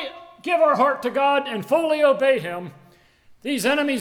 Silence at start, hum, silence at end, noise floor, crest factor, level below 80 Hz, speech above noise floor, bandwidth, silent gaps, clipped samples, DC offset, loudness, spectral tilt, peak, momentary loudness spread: 0 s; none; 0 s; -53 dBFS; 16 dB; -68 dBFS; 33 dB; 17.5 kHz; none; under 0.1%; under 0.1%; -20 LUFS; -4 dB/octave; -6 dBFS; 16 LU